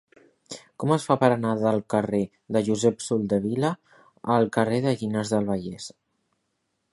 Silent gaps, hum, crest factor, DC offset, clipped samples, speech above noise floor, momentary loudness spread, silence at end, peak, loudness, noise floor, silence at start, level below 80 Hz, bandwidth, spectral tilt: none; none; 22 dB; under 0.1%; under 0.1%; 52 dB; 16 LU; 1.05 s; -4 dBFS; -25 LUFS; -76 dBFS; 0.5 s; -60 dBFS; 11.5 kHz; -6 dB/octave